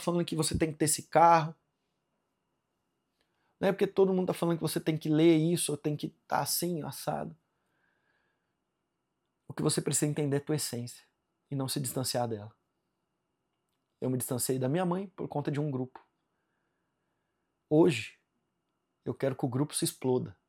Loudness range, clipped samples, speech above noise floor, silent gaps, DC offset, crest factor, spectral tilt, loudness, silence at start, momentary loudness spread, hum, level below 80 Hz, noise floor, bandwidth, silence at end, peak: 8 LU; under 0.1%; 53 dB; none; under 0.1%; 22 dB; -5 dB/octave; -30 LUFS; 0 s; 14 LU; none; -62 dBFS; -82 dBFS; 17.5 kHz; 0.15 s; -10 dBFS